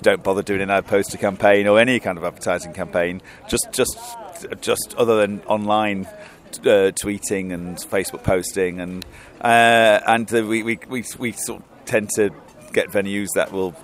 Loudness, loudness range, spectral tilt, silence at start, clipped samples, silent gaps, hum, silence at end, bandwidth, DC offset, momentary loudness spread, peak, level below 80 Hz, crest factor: -20 LUFS; 4 LU; -4 dB/octave; 0 s; under 0.1%; none; none; 0 s; 16 kHz; under 0.1%; 14 LU; 0 dBFS; -50 dBFS; 20 dB